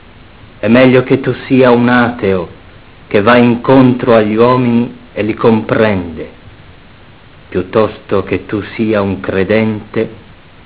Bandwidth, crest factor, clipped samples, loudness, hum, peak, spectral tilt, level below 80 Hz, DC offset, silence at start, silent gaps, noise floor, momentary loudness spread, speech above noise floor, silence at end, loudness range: 4 kHz; 12 dB; 0.8%; -11 LUFS; none; 0 dBFS; -11 dB/octave; -40 dBFS; 0.6%; 0.65 s; none; -39 dBFS; 12 LU; 28 dB; 0.5 s; 7 LU